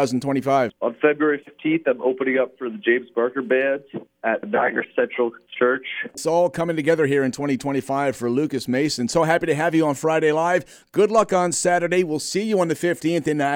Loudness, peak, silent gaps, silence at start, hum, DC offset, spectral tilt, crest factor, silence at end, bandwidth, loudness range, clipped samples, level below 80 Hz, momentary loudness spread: -21 LUFS; -4 dBFS; none; 0 s; none; under 0.1%; -5 dB/octave; 18 dB; 0 s; 17 kHz; 3 LU; under 0.1%; -62 dBFS; 6 LU